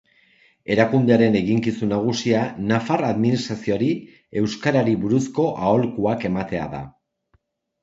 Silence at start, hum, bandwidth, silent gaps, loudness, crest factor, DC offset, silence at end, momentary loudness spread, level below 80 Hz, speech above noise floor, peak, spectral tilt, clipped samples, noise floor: 0.7 s; none; 7.8 kHz; none; -21 LUFS; 20 dB; under 0.1%; 0.9 s; 10 LU; -52 dBFS; 45 dB; -2 dBFS; -6.5 dB/octave; under 0.1%; -65 dBFS